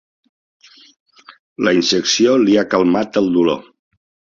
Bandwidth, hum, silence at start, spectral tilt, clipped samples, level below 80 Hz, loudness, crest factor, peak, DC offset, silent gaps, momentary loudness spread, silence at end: 7.4 kHz; none; 1.3 s; -4 dB/octave; under 0.1%; -56 dBFS; -15 LUFS; 16 dB; -2 dBFS; under 0.1%; 1.39-1.56 s; 6 LU; 0.7 s